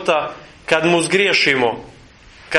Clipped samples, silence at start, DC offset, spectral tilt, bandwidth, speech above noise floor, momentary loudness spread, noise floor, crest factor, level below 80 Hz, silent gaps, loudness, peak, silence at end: under 0.1%; 0 s; under 0.1%; -3.5 dB/octave; 11.5 kHz; 27 dB; 17 LU; -44 dBFS; 18 dB; -52 dBFS; none; -16 LUFS; 0 dBFS; 0 s